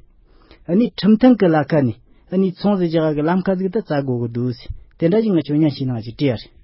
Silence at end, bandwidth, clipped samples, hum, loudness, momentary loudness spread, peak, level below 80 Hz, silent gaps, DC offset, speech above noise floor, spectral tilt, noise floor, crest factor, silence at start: 0.2 s; 5.8 kHz; under 0.1%; none; -18 LUFS; 11 LU; 0 dBFS; -46 dBFS; none; under 0.1%; 32 dB; -12.5 dB/octave; -49 dBFS; 18 dB; 0.7 s